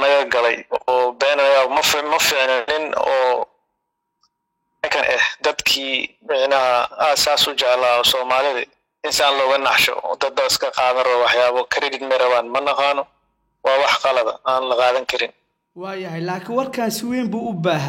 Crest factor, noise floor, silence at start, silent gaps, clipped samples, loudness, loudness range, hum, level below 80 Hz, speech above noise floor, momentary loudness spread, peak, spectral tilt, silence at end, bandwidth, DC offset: 16 dB; -75 dBFS; 0 s; none; under 0.1%; -18 LUFS; 4 LU; none; -58 dBFS; 57 dB; 9 LU; -2 dBFS; -2.5 dB/octave; 0 s; 16.5 kHz; under 0.1%